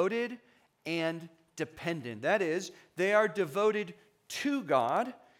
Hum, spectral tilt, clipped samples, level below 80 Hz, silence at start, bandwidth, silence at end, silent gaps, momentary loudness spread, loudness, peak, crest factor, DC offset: none; -5 dB/octave; under 0.1%; -78 dBFS; 0 s; 17 kHz; 0.25 s; none; 15 LU; -32 LUFS; -12 dBFS; 20 dB; under 0.1%